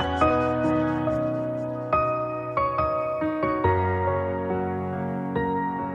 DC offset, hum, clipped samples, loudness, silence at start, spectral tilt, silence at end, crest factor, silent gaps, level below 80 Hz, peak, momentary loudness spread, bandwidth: under 0.1%; none; under 0.1%; -25 LUFS; 0 s; -8.5 dB/octave; 0 s; 18 dB; none; -46 dBFS; -6 dBFS; 6 LU; 9.2 kHz